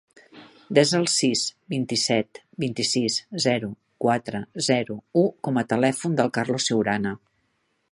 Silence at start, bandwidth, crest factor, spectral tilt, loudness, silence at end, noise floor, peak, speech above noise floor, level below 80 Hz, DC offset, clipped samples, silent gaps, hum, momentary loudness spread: 0.35 s; 11.5 kHz; 22 dB; -4 dB/octave; -23 LUFS; 0.75 s; -71 dBFS; -2 dBFS; 48 dB; -64 dBFS; under 0.1%; under 0.1%; none; none; 9 LU